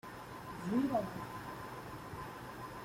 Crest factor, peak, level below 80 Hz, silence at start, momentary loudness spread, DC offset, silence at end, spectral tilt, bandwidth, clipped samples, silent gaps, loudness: 18 dB; -22 dBFS; -64 dBFS; 0.05 s; 13 LU; under 0.1%; 0 s; -6.5 dB/octave; 16.5 kHz; under 0.1%; none; -41 LUFS